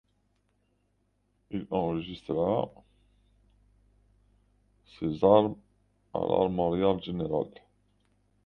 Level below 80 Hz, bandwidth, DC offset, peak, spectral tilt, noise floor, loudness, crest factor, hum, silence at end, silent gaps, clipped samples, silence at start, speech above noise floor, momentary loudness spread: -58 dBFS; 5.8 kHz; under 0.1%; -6 dBFS; -9.5 dB/octave; -73 dBFS; -29 LUFS; 24 dB; 50 Hz at -55 dBFS; 0.95 s; none; under 0.1%; 1.5 s; 45 dB; 17 LU